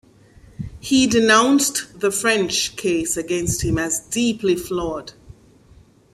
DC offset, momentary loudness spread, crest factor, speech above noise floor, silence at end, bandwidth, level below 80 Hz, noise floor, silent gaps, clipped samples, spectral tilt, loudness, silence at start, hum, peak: under 0.1%; 15 LU; 20 dB; 31 dB; 1.05 s; 15.5 kHz; -44 dBFS; -50 dBFS; none; under 0.1%; -3 dB/octave; -19 LUFS; 0.6 s; none; -2 dBFS